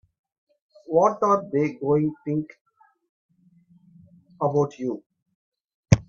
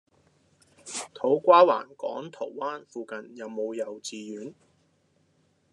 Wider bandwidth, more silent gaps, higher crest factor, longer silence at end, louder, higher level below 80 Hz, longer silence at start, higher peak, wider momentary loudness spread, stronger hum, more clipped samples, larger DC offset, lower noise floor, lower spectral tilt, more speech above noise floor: second, 8 kHz vs 11 kHz; first, 2.61-2.65 s, 3.09-3.29 s, 5.06-5.10 s, 5.22-5.26 s, 5.35-5.52 s, 5.74-5.83 s vs none; about the same, 26 dB vs 22 dB; second, 0.05 s vs 1.2 s; about the same, -24 LUFS vs -26 LUFS; first, -50 dBFS vs -86 dBFS; about the same, 0.9 s vs 0.85 s; first, 0 dBFS vs -6 dBFS; second, 11 LU vs 21 LU; neither; neither; neither; second, -58 dBFS vs -68 dBFS; first, -7.5 dB/octave vs -4 dB/octave; second, 35 dB vs 42 dB